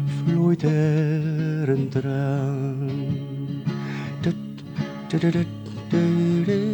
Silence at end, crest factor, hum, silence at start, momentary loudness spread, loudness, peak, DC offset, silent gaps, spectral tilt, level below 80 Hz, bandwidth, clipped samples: 0 s; 14 dB; none; 0 s; 10 LU; -24 LUFS; -10 dBFS; under 0.1%; none; -8.5 dB/octave; -58 dBFS; 19 kHz; under 0.1%